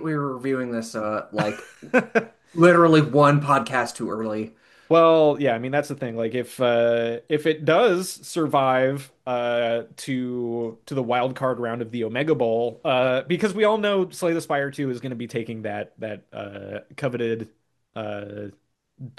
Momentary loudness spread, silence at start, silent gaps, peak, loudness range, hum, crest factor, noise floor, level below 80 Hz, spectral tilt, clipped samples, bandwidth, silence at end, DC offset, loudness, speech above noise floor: 16 LU; 0 s; none; -4 dBFS; 9 LU; none; 18 dB; -42 dBFS; -70 dBFS; -6 dB/octave; under 0.1%; 12.5 kHz; 0.1 s; under 0.1%; -22 LUFS; 20 dB